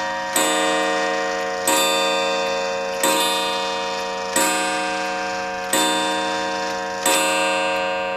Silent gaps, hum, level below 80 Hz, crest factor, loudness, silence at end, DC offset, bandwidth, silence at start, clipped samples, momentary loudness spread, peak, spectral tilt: none; none; -58 dBFS; 18 dB; -20 LUFS; 0 s; under 0.1%; 15.5 kHz; 0 s; under 0.1%; 6 LU; -4 dBFS; -1 dB/octave